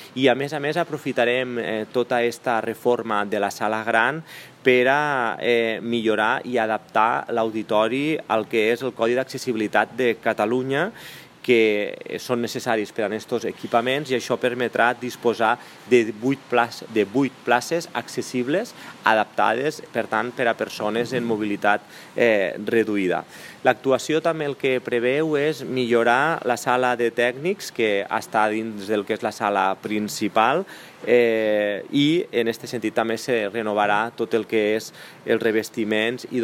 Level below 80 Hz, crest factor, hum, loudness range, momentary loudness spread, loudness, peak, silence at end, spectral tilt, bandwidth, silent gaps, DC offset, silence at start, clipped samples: -72 dBFS; 20 dB; none; 2 LU; 7 LU; -22 LUFS; -2 dBFS; 0 s; -4.5 dB/octave; 16 kHz; none; under 0.1%; 0 s; under 0.1%